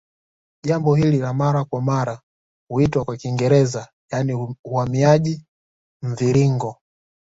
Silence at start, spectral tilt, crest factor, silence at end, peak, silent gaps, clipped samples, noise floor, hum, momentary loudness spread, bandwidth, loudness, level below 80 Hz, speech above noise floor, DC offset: 0.65 s; -7.5 dB/octave; 18 dB; 0.55 s; -2 dBFS; 2.23-2.67 s, 3.93-4.08 s, 4.59-4.64 s, 5.48-6.00 s; under 0.1%; under -90 dBFS; none; 13 LU; 7.8 kHz; -20 LUFS; -50 dBFS; over 71 dB; under 0.1%